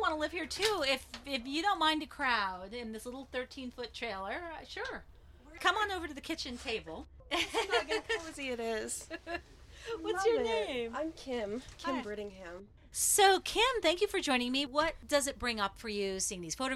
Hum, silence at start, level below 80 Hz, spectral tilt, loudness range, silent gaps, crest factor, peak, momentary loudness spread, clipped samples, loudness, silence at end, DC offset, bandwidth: none; 0 s; -56 dBFS; -2 dB/octave; 7 LU; none; 22 dB; -14 dBFS; 13 LU; under 0.1%; -34 LUFS; 0 s; under 0.1%; 16 kHz